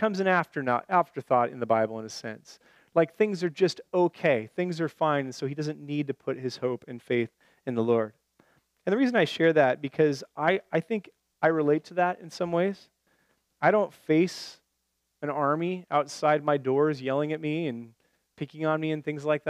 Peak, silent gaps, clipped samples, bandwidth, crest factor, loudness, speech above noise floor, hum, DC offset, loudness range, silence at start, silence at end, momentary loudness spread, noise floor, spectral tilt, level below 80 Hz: -8 dBFS; none; under 0.1%; 13.5 kHz; 20 dB; -27 LUFS; 51 dB; none; under 0.1%; 4 LU; 0 s; 0 s; 10 LU; -78 dBFS; -6.5 dB/octave; -78 dBFS